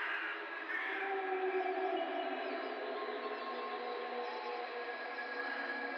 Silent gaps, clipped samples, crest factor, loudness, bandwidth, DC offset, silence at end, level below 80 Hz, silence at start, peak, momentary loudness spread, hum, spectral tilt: none; under 0.1%; 14 dB; -39 LUFS; 6.4 kHz; under 0.1%; 0 s; under -90 dBFS; 0 s; -26 dBFS; 5 LU; none; -3 dB/octave